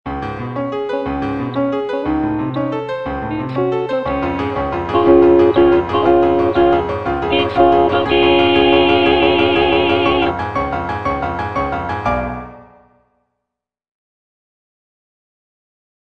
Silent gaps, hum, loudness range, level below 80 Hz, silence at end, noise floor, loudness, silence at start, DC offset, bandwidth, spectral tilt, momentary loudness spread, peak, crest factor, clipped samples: none; none; 10 LU; -36 dBFS; 3.4 s; -80 dBFS; -15 LUFS; 0.05 s; under 0.1%; 6 kHz; -7.5 dB/octave; 11 LU; 0 dBFS; 16 dB; under 0.1%